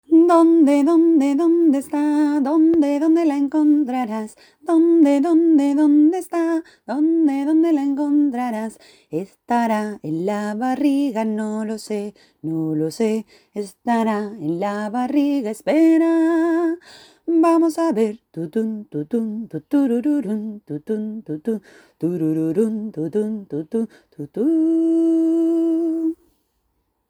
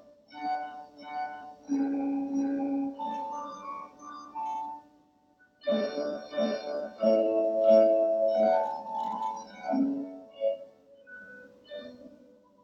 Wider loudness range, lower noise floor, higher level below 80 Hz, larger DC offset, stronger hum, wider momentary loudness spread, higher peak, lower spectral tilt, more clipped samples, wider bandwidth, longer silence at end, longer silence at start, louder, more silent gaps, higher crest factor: second, 7 LU vs 10 LU; first, -70 dBFS vs -64 dBFS; first, -68 dBFS vs -76 dBFS; neither; neither; second, 14 LU vs 20 LU; first, -4 dBFS vs -10 dBFS; about the same, -7 dB/octave vs -6 dB/octave; neither; first, 19 kHz vs 7 kHz; first, 0.95 s vs 0.5 s; second, 0.1 s vs 0.3 s; first, -19 LUFS vs -29 LUFS; neither; about the same, 16 dB vs 20 dB